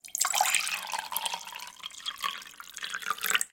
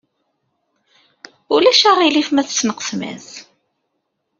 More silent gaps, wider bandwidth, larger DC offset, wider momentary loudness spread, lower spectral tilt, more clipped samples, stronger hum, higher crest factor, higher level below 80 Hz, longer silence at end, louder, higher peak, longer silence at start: neither; first, 17 kHz vs 7.6 kHz; neither; second, 15 LU vs 22 LU; second, 2.5 dB/octave vs -2 dB/octave; neither; neither; first, 26 dB vs 18 dB; second, -76 dBFS vs -64 dBFS; second, 0.05 s vs 1 s; second, -30 LUFS vs -14 LUFS; second, -8 dBFS vs -2 dBFS; second, 0.05 s vs 1.5 s